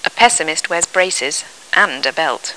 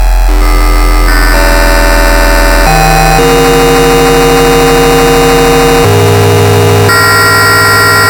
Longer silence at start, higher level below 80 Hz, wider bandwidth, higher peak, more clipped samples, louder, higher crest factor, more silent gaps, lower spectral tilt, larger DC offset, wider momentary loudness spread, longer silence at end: about the same, 0.05 s vs 0 s; second, -54 dBFS vs -10 dBFS; second, 11 kHz vs 19.5 kHz; about the same, 0 dBFS vs 0 dBFS; neither; second, -15 LUFS vs -5 LUFS; first, 16 dB vs 4 dB; neither; second, 0 dB/octave vs -4.5 dB/octave; first, 0.1% vs under 0.1%; about the same, 7 LU vs 5 LU; about the same, 0 s vs 0 s